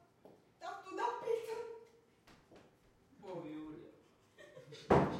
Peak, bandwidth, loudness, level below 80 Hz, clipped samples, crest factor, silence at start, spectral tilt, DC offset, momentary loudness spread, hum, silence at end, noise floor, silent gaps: -16 dBFS; 15.5 kHz; -41 LUFS; -64 dBFS; under 0.1%; 26 dB; 0.25 s; -7 dB/octave; under 0.1%; 24 LU; none; 0 s; -68 dBFS; none